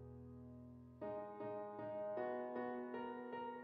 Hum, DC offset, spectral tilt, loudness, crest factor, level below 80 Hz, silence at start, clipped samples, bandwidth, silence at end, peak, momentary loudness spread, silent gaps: none; under 0.1%; -6 dB/octave; -48 LUFS; 16 dB; -74 dBFS; 0 s; under 0.1%; 5.2 kHz; 0 s; -32 dBFS; 12 LU; none